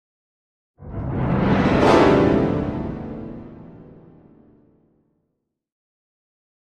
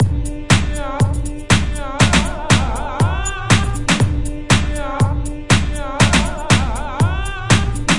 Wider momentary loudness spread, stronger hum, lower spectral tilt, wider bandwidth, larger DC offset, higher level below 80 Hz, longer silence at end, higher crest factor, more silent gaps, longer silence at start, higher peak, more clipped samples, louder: first, 22 LU vs 9 LU; neither; first, -7.5 dB/octave vs -4.5 dB/octave; about the same, 10.5 kHz vs 11.5 kHz; neither; second, -40 dBFS vs -24 dBFS; first, 2.9 s vs 0 s; about the same, 20 dB vs 16 dB; neither; first, 0.8 s vs 0 s; about the same, -2 dBFS vs 0 dBFS; neither; about the same, -19 LUFS vs -17 LUFS